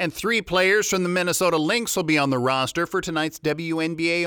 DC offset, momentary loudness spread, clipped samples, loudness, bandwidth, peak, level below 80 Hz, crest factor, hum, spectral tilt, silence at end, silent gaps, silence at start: under 0.1%; 6 LU; under 0.1%; -22 LUFS; over 20 kHz; -6 dBFS; -54 dBFS; 16 dB; none; -3.5 dB/octave; 0 s; none; 0 s